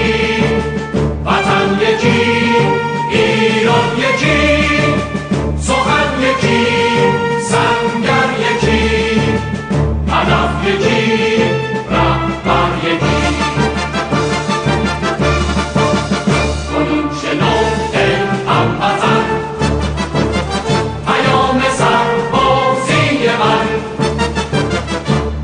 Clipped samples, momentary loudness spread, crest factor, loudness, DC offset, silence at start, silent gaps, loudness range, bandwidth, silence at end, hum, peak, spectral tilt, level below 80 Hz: under 0.1%; 5 LU; 14 dB; -14 LUFS; under 0.1%; 0 s; none; 2 LU; 10 kHz; 0 s; none; 0 dBFS; -5.5 dB/octave; -28 dBFS